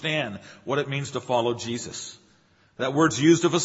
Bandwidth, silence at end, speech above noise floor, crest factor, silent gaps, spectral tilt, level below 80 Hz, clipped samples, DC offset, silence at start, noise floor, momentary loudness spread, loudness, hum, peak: 8 kHz; 0 s; 36 dB; 20 dB; none; -4.5 dB/octave; -64 dBFS; under 0.1%; under 0.1%; 0 s; -60 dBFS; 16 LU; -25 LUFS; none; -6 dBFS